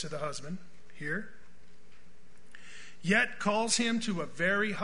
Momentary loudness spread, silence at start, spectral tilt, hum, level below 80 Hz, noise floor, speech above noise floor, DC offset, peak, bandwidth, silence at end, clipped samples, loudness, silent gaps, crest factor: 21 LU; 0 s; -3.5 dB/octave; none; -64 dBFS; -61 dBFS; 30 dB; 1%; -12 dBFS; 10.5 kHz; 0 s; under 0.1%; -31 LUFS; none; 20 dB